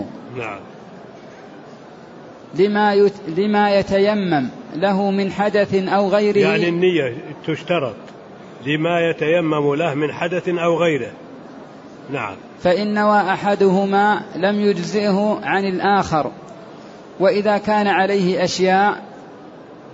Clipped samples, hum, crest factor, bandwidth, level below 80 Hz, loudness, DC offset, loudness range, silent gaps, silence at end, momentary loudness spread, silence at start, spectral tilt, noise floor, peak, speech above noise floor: under 0.1%; none; 14 dB; 8 kHz; -56 dBFS; -18 LUFS; under 0.1%; 3 LU; none; 0 s; 23 LU; 0 s; -6 dB/octave; -39 dBFS; -4 dBFS; 22 dB